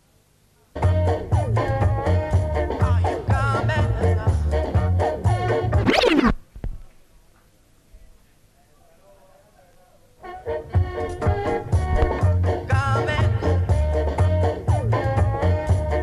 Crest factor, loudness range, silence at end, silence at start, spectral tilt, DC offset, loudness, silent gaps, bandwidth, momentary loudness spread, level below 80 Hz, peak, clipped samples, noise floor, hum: 16 dB; 8 LU; 0 s; 0.75 s; -7.5 dB/octave; under 0.1%; -22 LUFS; none; 11 kHz; 5 LU; -30 dBFS; -4 dBFS; under 0.1%; -59 dBFS; none